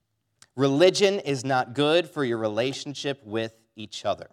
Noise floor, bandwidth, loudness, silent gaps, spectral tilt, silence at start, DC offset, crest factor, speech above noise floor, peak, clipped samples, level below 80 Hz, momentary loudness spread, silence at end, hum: -61 dBFS; 14 kHz; -25 LUFS; none; -4.5 dB/octave; 0.55 s; under 0.1%; 18 dB; 37 dB; -6 dBFS; under 0.1%; -78 dBFS; 14 LU; 0.1 s; none